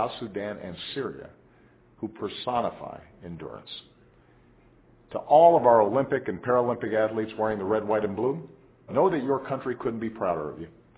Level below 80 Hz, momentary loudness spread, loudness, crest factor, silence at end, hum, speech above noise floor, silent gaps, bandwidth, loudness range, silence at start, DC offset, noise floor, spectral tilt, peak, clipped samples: -60 dBFS; 20 LU; -26 LUFS; 22 dB; 0.3 s; none; 32 dB; none; 4 kHz; 13 LU; 0 s; under 0.1%; -58 dBFS; -10 dB/octave; -6 dBFS; under 0.1%